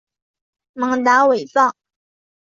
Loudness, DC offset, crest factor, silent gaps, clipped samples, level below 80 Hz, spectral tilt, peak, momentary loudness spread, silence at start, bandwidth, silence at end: -16 LUFS; under 0.1%; 16 dB; none; under 0.1%; -68 dBFS; -3.5 dB/octave; -2 dBFS; 7 LU; 0.75 s; 7.6 kHz; 0.85 s